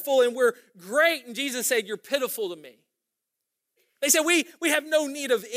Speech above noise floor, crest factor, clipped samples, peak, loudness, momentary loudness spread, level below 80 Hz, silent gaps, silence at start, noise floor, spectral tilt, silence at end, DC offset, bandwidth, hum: 59 dB; 20 dB; under 0.1%; -6 dBFS; -24 LUFS; 9 LU; -88 dBFS; none; 0 s; -84 dBFS; -1 dB/octave; 0 s; under 0.1%; 16 kHz; none